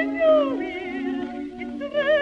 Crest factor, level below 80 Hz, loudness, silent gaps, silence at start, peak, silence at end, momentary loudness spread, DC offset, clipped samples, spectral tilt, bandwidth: 14 dB; -56 dBFS; -24 LUFS; none; 0 s; -8 dBFS; 0 s; 14 LU; under 0.1%; under 0.1%; -5.5 dB/octave; 6.6 kHz